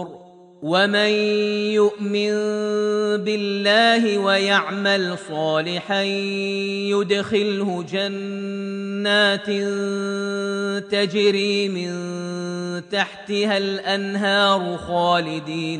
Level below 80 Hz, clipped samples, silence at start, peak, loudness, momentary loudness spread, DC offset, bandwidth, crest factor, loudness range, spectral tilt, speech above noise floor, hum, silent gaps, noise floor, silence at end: -64 dBFS; under 0.1%; 0 s; -4 dBFS; -21 LUFS; 10 LU; under 0.1%; 10 kHz; 18 dB; 4 LU; -4.5 dB/octave; 23 dB; none; none; -43 dBFS; 0 s